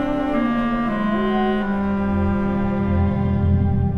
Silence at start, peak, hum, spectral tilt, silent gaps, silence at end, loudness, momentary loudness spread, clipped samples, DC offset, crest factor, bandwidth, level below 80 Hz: 0 s; -8 dBFS; none; -9.5 dB/octave; none; 0 s; -20 LUFS; 2 LU; under 0.1%; under 0.1%; 12 dB; 5.2 kHz; -32 dBFS